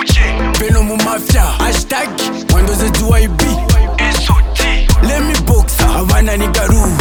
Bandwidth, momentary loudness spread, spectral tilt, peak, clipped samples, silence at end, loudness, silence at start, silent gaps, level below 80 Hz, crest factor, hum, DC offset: over 20 kHz; 3 LU; -4.5 dB/octave; 0 dBFS; under 0.1%; 0 s; -13 LUFS; 0 s; none; -12 dBFS; 10 dB; none; under 0.1%